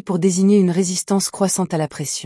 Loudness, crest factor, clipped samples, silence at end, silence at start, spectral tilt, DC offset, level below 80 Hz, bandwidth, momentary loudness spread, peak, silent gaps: -18 LUFS; 12 dB; under 0.1%; 0 s; 0.05 s; -5 dB/octave; under 0.1%; -62 dBFS; 12 kHz; 8 LU; -6 dBFS; none